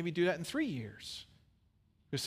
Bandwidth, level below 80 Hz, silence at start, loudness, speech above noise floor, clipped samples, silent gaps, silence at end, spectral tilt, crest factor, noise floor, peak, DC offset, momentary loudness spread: 15.5 kHz; -70 dBFS; 0 s; -37 LUFS; 35 dB; under 0.1%; none; 0 s; -5 dB/octave; 18 dB; -71 dBFS; -20 dBFS; under 0.1%; 13 LU